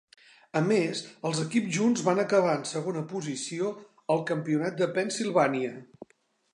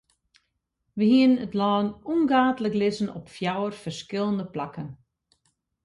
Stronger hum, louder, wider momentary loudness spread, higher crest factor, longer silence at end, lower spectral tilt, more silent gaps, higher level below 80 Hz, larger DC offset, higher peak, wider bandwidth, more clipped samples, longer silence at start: neither; second, -28 LUFS vs -25 LUFS; second, 9 LU vs 15 LU; about the same, 18 dB vs 18 dB; second, 0.5 s vs 0.9 s; second, -5 dB/octave vs -6.5 dB/octave; neither; second, -78 dBFS vs -64 dBFS; neither; about the same, -10 dBFS vs -8 dBFS; about the same, 11 kHz vs 11 kHz; neither; second, 0.55 s vs 0.95 s